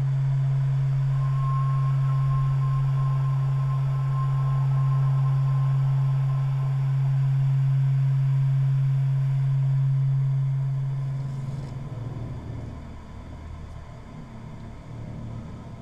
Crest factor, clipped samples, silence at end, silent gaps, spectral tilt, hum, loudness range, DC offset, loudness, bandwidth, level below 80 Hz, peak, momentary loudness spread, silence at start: 8 dB; under 0.1%; 0 s; none; -9.5 dB/octave; none; 14 LU; under 0.1%; -24 LUFS; 4.9 kHz; -44 dBFS; -16 dBFS; 18 LU; 0 s